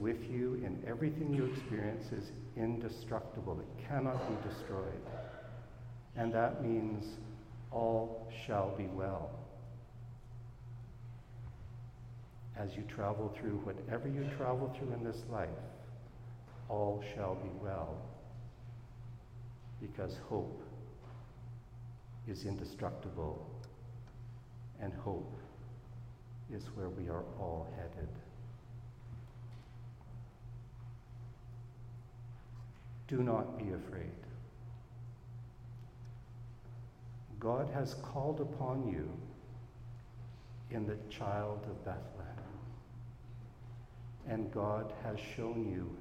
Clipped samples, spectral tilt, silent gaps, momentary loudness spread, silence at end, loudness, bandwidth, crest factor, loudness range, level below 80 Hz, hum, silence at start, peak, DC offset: under 0.1%; -8 dB/octave; none; 15 LU; 0 s; -43 LUFS; 15 kHz; 22 dB; 10 LU; -58 dBFS; none; 0 s; -20 dBFS; under 0.1%